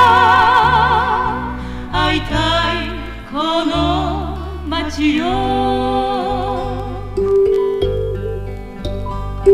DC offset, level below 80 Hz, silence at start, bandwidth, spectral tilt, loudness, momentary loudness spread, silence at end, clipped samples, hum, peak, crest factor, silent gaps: under 0.1%; -28 dBFS; 0 s; 14.5 kHz; -6 dB/octave; -17 LUFS; 14 LU; 0 s; under 0.1%; none; -2 dBFS; 14 dB; none